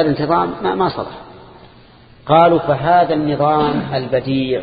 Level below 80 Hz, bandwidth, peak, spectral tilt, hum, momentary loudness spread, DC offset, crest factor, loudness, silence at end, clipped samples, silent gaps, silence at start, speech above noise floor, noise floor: -46 dBFS; 5 kHz; 0 dBFS; -10 dB/octave; none; 12 LU; under 0.1%; 16 dB; -15 LUFS; 0 s; under 0.1%; none; 0 s; 29 dB; -44 dBFS